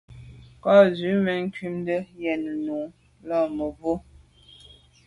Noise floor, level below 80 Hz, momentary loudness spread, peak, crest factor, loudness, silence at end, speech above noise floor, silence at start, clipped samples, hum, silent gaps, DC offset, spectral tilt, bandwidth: -52 dBFS; -56 dBFS; 14 LU; -4 dBFS; 20 dB; -24 LUFS; 1.05 s; 29 dB; 0.1 s; under 0.1%; none; none; under 0.1%; -7.5 dB/octave; 11 kHz